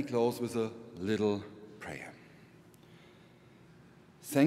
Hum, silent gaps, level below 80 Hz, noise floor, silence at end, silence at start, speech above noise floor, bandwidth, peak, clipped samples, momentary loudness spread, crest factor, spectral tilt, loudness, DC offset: none; none; -72 dBFS; -58 dBFS; 0 s; 0 s; 25 dB; 16 kHz; -14 dBFS; under 0.1%; 26 LU; 22 dB; -6 dB/octave; -35 LUFS; under 0.1%